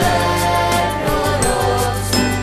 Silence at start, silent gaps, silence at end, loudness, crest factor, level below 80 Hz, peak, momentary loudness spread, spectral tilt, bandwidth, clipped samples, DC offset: 0 s; none; 0 s; -17 LUFS; 14 dB; -30 dBFS; -2 dBFS; 2 LU; -4 dB/octave; 14 kHz; under 0.1%; under 0.1%